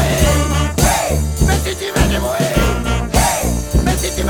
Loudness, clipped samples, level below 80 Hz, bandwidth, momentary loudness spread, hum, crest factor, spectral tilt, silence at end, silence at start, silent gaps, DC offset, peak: -16 LUFS; under 0.1%; -20 dBFS; over 20 kHz; 4 LU; none; 14 dB; -4.5 dB/octave; 0 s; 0 s; none; under 0.1%; 0 dBFS